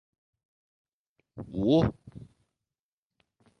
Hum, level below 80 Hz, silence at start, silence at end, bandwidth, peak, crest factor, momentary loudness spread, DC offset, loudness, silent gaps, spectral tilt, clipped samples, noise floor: none; -52 dBFS; 1.35 s; 1.35 s; 6.6 kHz; -12 dBFS; 22 dB; 25 LU; under 0.1%; -27 LUFS; none; -8.5 dB/octave; under 0.1%; under -90 dBFS